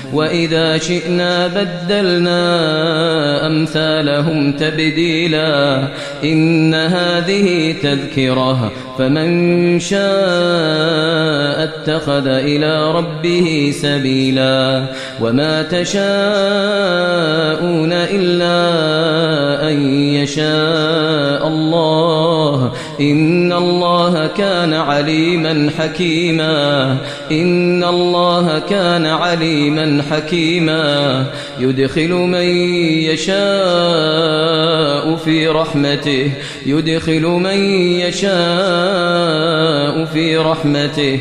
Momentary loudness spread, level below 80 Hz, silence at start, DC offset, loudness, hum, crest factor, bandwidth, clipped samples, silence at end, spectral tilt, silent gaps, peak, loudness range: 3 LU; -48 dBFS; 0 s; 0.1%; -14 LUFS; none; 12 dB; 11 kHz; under 0.1%; 0 s; -5.5 dB/octave; none; -2 dBFS; 1 LU